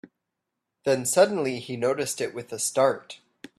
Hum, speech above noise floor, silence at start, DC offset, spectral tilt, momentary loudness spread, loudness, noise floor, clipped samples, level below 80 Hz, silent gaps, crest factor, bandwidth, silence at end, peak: none; 58 dB; 0.85 s; under 0.1%; -3.5 dB/octave; 12 LU; -25 LUFS; -83 dBFS; under 0.1%; -70 dBFS; none; 20 dB; 14.5 kHz; 0.45 s; -6 dBFS